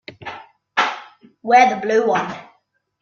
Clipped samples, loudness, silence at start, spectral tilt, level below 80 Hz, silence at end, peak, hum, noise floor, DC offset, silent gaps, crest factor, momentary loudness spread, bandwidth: under 0.1%; -17 LUFS; 0.1 s; -4 dB/octave; -66 dBFS; 0.6 s; -2 dBFS; none; -64 dBFS; under 0.1%; none; 18 dB; 21 LU; 7.2 kHz